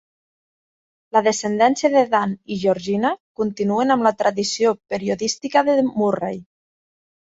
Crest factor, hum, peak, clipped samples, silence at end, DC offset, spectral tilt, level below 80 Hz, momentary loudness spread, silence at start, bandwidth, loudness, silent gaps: 18 dB; none; -4 dBFS; under 0.1%; 0.85 s; under 0.1%; -4.5 dB/octave; -62 dBFS; 8 LU; 1.15 s; 8 kHz; -20 LUFS; 3.20-3.35 s